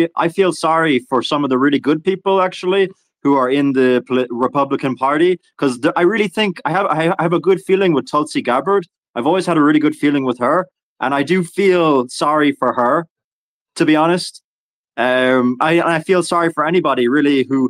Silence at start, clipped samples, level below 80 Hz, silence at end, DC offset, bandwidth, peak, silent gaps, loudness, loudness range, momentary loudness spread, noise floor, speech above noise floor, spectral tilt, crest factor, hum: 0 s; under 0.1%; -64 dBFS; 0 s; under 0.1%; 12.5 kHz; -2 dBFS; 8.98-9.03 s, 9.09-9.14 s, 10.83-10.96 s, 13.10-13.16 s, 13.24-13.66 s, 14.44-14.84 s; -16 LUFS; 1 LU; 5 LU; under -90 dBFS; over 75 dB; -5.5 dB/octave; 14 dB; none